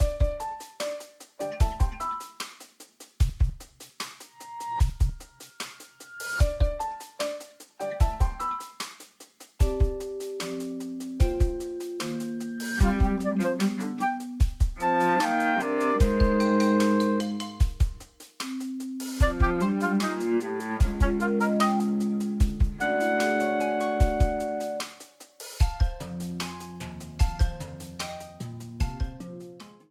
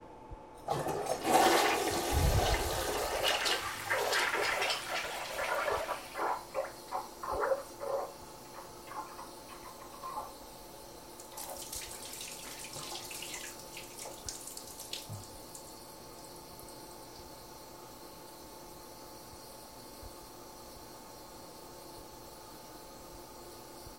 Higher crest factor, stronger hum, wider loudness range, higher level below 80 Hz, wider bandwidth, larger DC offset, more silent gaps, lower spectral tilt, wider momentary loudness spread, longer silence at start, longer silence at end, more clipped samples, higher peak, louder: second, 18 dB vs 24 dB; neither; second, 7 LU vs 19 LU; first, -30 dBFS vs -50 dBFS; about the same, 15.5 kHz vs 16.5 kHz; neither; neither; first, -6 dB/octave vs -3 dB/octave; second, 16 LU vs 19 LU; about the same, 0 s vs 0 s; first, 0.2 s vs 0 s; neither; first, -10 dBFS vs -14 dBFS; first, -28 LUFS vs -34 LUFS